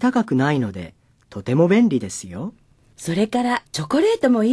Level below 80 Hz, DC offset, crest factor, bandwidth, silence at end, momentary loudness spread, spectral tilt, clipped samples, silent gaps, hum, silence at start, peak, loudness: -56 dBFS; under 0.1%; 16 dB; 11 kHz; 0 s; 16 LU; -6 dB/octave; under 0.1%; none; none; 0 s; -2 dBFS; -20 LUFS